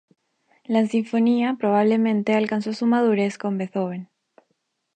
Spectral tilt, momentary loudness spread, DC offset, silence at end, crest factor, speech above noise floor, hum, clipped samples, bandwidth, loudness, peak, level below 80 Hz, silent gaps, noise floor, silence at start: -7 dB/octave; 8 LU; under 0.1%; 0.9 s; 16 dB; 53 dB; none; under 0.1%; 8.8 kHz; -22 LUFS; -6 dBFS; -76 dBFS; none; -73 dBFS; 0.7 s